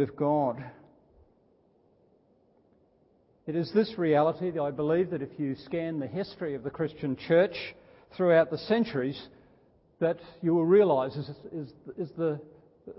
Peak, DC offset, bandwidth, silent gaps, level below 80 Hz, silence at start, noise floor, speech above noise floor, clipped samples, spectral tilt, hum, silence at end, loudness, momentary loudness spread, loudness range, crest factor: -10 dBFS; under 0.1%; 5.8 kHz; none; -66 dBFS; 0 s; -65 dBFS; 38 dB; under 0.1%; -11 dB/octave; none; 0.05 s; -28 LUFS; 17 LU; 7 LU; 18 dB